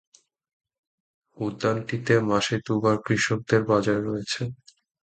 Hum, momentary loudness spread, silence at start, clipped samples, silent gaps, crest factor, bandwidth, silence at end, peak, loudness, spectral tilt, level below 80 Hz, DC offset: none; 9 LU; 1.35 s; under 0.1%; none; 20 dB; 9.2 kHz; 0.5 s; -6 dBFS; -25 LUFS; -5.5 dB/octave; -58 dBFS; under 0.1%